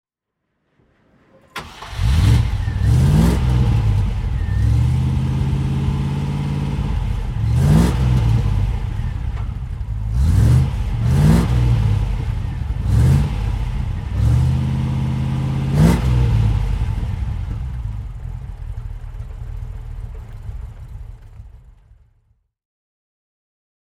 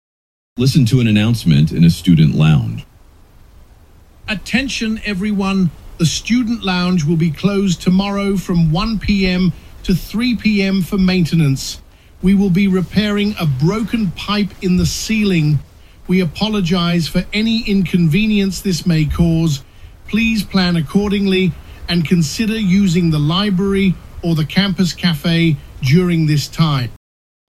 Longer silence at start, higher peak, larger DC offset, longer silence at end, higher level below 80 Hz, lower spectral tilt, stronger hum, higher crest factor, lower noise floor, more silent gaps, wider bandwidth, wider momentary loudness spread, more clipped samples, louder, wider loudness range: first, 1.55 s vs 0.55 s; about the same, -2 dBFS vs 0 dBFS; neither; first, 2.25 s vs 0.5 s; first, -24 dBFS vs -34 dBFS; first, -7.5 dB/octave vs -6 dB/octave; neither; about the same, 16 dB vs 16 dB; first, -76 dBFS vs -44 dBFS; neither; about the same, 14 kHz vs 15 kHz; first, 18 LU vs 7 LU; neither; second, -19 LUFS vs -15 LUFS; first, 15 LU vs 2 LU